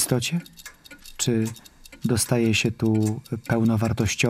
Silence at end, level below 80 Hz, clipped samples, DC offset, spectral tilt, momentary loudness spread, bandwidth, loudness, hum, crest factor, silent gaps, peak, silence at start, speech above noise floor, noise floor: 0 s; -52 dBFS; under 0.1%; under 0.1%; -5 dB/octave; 21 LU; 15.5 kHz; -24 LUFS; none; 18 dB; none; -6 dBFS; 0 s; 22 dB; -45 dBFS